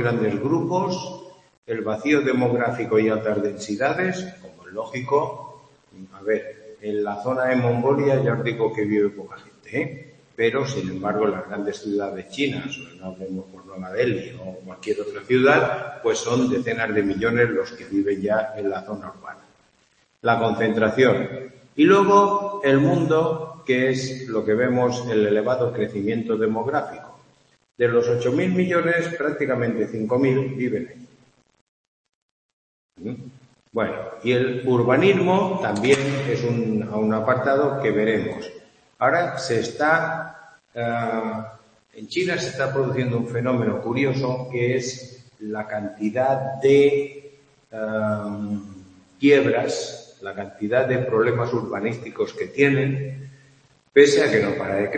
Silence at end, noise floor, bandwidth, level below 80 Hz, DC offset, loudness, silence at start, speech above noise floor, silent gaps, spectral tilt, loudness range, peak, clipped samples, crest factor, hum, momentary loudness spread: 0 s; -63 dBFS; 8.8 kHz; -62 dBFS; under 0.1%; -22 LUFS; 0 s; 41 dB; 1.57-1.63 s, 31.61-32.04 s, 32.15-32.89 s; -6 dB/octave; 7 LU; 0 dBFS; under 0.1%; 22 dB; none; 16 LU